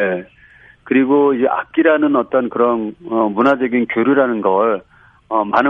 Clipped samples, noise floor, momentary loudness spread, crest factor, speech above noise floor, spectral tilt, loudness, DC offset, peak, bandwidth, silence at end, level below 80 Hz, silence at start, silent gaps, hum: under 0.1%; -43 dBFS; 7 LU; 16 dB; 28 dB; -8 dB/octave; -16 LUFS; under 0.1%; 0 dBFS; 5.2 kHz; 0 s; -58 dBFS; 0 s; none; none